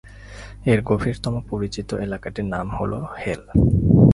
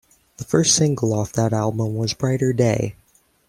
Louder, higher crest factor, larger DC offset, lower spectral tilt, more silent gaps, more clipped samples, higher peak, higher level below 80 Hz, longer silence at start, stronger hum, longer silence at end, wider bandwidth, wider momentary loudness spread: about the same, -22 LUFS vs -20 LUFS; about the same, 20 dB vs 18 dB; neither; first, -8 dB/octave vs -5 dB/octave; neither; neither; about the same, 0 dBFS vs -2 dBFS; first, -34 dBFS vs -52 dBFS; second, 0.05 s vs 0.4 s; neither; second, 0 s vs 0.55 s; second, 11.5 kHz vs 15.5 kHz; first, 11 LU vs 7 LU